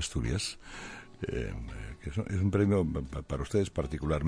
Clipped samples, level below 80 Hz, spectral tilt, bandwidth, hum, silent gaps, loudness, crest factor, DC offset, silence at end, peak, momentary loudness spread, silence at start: under 0.1%; -42 dBFS; -6 dB/octave; 10.5 kHz; none; none; -33 LUFS; 16 dB; under 0.1%; 0 s; -14 dBFS; 15 LU; 0 s